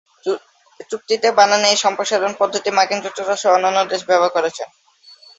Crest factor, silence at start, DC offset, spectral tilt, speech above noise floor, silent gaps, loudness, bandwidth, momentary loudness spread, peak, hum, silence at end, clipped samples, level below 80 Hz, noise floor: 18 dB; 0.25 s; under 0.1%; -1.5 dB/octave; 30 dB; none; -17 LUFS; 8.2 kHz; 13 LU; 0 dBFS; none; 0.75 s; under 0.1%; -68 dBFS; -47 dBFS